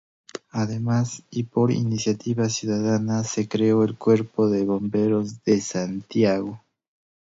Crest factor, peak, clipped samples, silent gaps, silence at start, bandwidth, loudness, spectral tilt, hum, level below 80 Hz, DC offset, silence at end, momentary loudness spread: 16 dB; -6 dBFS; under 0.1%; none; 0.35 s; 8 kHz; -23 LUFS; -6 dB/octave; none; -60 dBFS; under 0.1%; 0.7 s; 8 LU